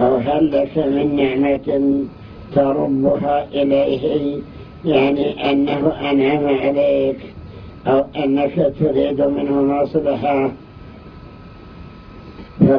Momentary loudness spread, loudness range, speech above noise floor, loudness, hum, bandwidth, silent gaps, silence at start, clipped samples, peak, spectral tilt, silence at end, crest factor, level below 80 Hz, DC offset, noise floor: 20 LU; 2 LU; 21 dB; -17 LUFS; none; 5.4 kHz; none; 0 s; under 0.1%; 0 dBFS; -10 dB/octave; 0 s; 18 dB; -44 dBFS; under 0.1%; -38 dBFS